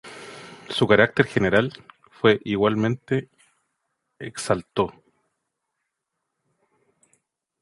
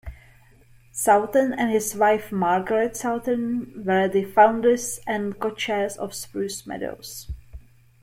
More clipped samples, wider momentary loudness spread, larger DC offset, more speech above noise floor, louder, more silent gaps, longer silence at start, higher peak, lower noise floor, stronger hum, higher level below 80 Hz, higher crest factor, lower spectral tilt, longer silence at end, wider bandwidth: neither; first, 22 LU vs 15 LU; neither; first, 59 dB vs 30 dB; about the same, -22 LUFS vs -23 LUFS; neither; about the same, 0.05 s vs 0.05 s; about the same, -2 dBFS vs -4 dBFS; first, -81 dBFS vs -53 dBFS; neither; second, -56 dBFS vs -48 dBFS; about the same, 24 dB vs 20 dB; about the same, -5.5 dB/octave vs -4.5 dB/octave; first, 2.7 s vs 0.45 s; second, 11.5 kHz vs 16.5 kHz